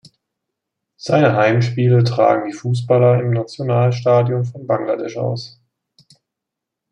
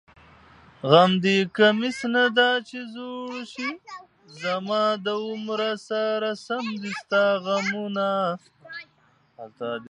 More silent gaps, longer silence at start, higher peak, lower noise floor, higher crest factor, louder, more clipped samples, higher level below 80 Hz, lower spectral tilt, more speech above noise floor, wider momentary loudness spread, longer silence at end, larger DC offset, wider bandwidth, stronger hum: neither; first, 1.05 s vs 0.85 s; about the same, -2 dBFS vs -2 dBFS; first, -82 dBFS vs -55 dBFS; second, 16 dB vs 24 dB; first, -17 LUFS vs -23 LUFS; neither; first, -60 dBFS vs -70 dBFS; first, -7.5 dB/octave vs -5 dB/octave; first, 66 dB vs 31 dB; second, 9 LU vs 19 LU; first, 1.45 s vs 0 s; neither; second, 8.6 kHz vs 11 kHz; neither